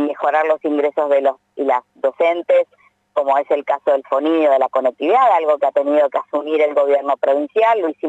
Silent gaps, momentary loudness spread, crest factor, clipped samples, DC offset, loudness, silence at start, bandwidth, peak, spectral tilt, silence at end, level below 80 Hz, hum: none; 5 LU; 12 dB; under 0.1%; under 0.1%; -17 LUFS; 0 s; 7.8 kHz; -4 dBFS; -4.5 dB/octave; 0 s; -82 dBFS; none